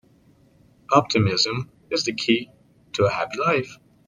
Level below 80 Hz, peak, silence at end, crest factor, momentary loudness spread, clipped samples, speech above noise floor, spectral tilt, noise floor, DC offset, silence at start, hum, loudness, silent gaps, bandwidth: -60 dBFS; -2 dBFS; 0.3 s; 22 dB; 12 LU; under 0.1%; 35 dB; -4.5 dB/octave; -56 dBFS; under 0.1%; 0.9 s; none; -22 LUFS; none; 10 kHz